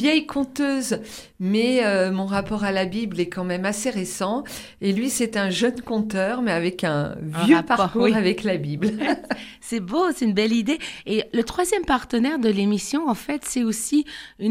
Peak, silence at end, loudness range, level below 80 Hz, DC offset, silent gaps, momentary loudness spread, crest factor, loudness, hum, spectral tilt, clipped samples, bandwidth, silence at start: -4 dBFS; 0 s; 3 LU; -52 dBFS; under 0.1%; none; 8 LU; 18 dB; -23 LUFS; none; -4.5 dB/octave; under 0.1%; 16 kHz; 0 s